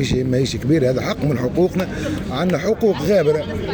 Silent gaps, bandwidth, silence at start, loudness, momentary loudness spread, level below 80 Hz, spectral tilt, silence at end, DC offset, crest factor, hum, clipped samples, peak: none; over 20 kHz; 0 s; -19 LUFS; 6 LU; -38 dBFS; -6.5 dB/octave; 0 s; under 0.1%; 12 dB; none; under 0.1%; -6 dBFS